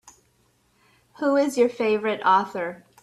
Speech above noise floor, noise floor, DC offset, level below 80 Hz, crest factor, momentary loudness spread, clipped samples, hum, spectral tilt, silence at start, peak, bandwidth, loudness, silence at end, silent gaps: 43 dB; -65 dBFS; under 0.1%; -70 dBFS; 18 dB; 10 LU; under 0.1%; none; -4.5 dB/octave; 1.2 s; -8 dBFS; 13 kHz; -23 LUFS; 0.25 s; none